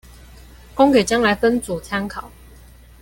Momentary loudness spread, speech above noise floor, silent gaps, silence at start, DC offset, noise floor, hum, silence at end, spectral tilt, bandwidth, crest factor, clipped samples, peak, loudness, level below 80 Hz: 16 LU; 27 dB; none; 0.75 s; under 0.1%; -44 dBFS; none; 0.75 s; -4.5 dB/octave; 17 kHz; 18 dB; under 0.1%; -2 dBFS; -18 LUFS; -42 dBFS